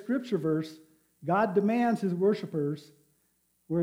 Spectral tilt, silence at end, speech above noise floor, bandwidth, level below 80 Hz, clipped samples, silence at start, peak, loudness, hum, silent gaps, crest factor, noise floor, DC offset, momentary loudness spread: -8 dB/octave; 0 s; 44 dB; 16 kHz; -80 dBFS; under 0.1%; 0 s; -14 dBFS; -29 LUFS; none; none; 16 dB; -72 dBFS; under 0.1%; 11 LU